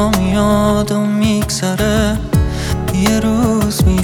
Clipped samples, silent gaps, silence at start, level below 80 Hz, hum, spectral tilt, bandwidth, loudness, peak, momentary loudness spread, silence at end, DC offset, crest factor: under 0.1%; none; 0 s; -24 dBFS; none; -5.5 dB/octave; 18.5 kHz; -15 LUFS; 0 dBFS; 4 LU; 0 s; under 0.1%; 14 dB